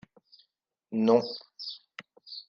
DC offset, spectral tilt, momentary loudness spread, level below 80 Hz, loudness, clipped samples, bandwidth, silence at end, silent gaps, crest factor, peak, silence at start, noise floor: under 0.1%; -6.5 dB/octave; 22 LU; -82 dBFS; -29 LUFS; under 0.1%; 6.8 kHz; 0.05 s; none; 22 dB; -10 dBFS; 0.9 s; -78 dBFS